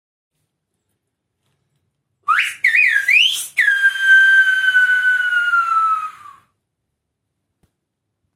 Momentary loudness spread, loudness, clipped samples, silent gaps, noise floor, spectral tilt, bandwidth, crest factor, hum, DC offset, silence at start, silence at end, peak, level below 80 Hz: 8 LU; -13 LUFS; under 0.1%; none; -76 dBFS; 4 dB/octave; 16 kHz; 14 dB; none; under 0.1%; 2.3 s; 2.25 s; -2 dBFS; -74 dBFS